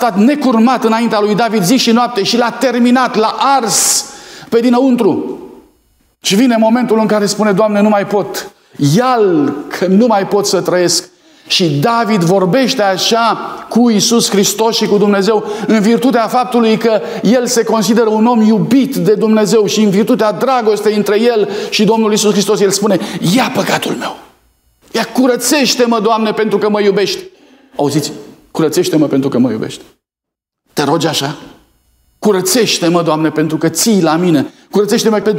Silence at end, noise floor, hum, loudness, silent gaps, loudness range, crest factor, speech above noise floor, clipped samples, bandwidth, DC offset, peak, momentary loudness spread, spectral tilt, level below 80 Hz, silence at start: 0 s; -83 dBFS; none; -12 LUFS; none; 4 LU; 12 dB; 71 dB; under 0.1%; 16.5 kHz; under 0.1%; 0 dBFS; 7 LU; -4.5 dB/octave; -58 dBFS; 0 s